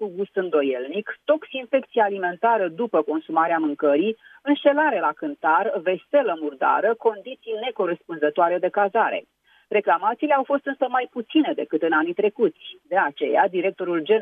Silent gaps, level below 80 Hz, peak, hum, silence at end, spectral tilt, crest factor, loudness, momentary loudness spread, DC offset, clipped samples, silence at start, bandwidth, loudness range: none; -80 dBFS; -6 dBFS; none; 0 s; -8 dB/octave; 16 dB; -22 LUFS; 6 LU; under 0.1%; under 0.1%; 0 s; 4.6 kHz; 2 LU